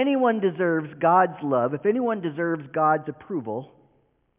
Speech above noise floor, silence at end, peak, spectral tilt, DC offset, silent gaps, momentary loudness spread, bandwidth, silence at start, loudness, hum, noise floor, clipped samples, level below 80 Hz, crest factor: 42 dB; 0.75 s; -6 dBFS; -10.5 dB/octave; under 0.1%; none; 11 LU; 3.7 kHz; 0 s; -24 LUFS; none; -66 dBFS; under 0.1%; -72 dBFS; 18 dB